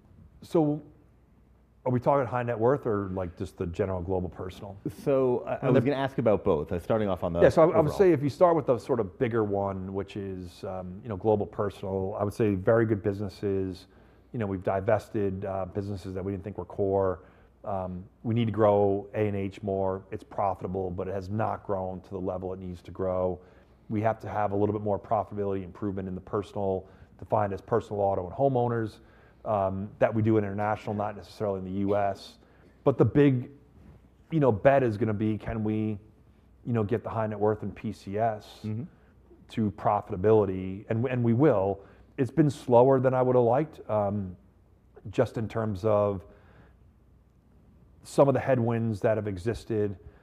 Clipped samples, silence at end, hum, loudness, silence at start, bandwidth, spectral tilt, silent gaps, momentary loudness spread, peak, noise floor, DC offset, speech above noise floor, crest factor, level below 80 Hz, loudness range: under 0.1%; 0.15 s; none; -28 LUFS; 0.4 s; 13 kHz; -8.5 dB/octave; none; 14 LU; -8 dBFS; -60 dBFS; under 0.1%; 33 dB; 20 dB; -58 dBFS; 7 LU